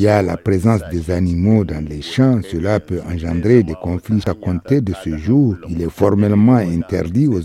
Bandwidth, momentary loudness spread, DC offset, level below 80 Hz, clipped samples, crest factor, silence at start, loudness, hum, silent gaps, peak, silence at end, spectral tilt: 13.5 kHz; 9 LU; under 0.1%; -36 dBFS; under 0.1%; 16 dB; 0 s; -17 LUFS; none; none; 0 dBFS; 0 s; -8.5 dB/octave